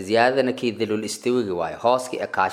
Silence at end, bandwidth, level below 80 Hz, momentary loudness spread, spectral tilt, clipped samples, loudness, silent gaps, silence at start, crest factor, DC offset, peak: 0 s; 16 kHz; -64 dBFS; 7 LU; -4.5 dB/octave; under 0.1%; -23 LUFS; none; 0 s; 20 dB; under 0.1%; -2 dBFS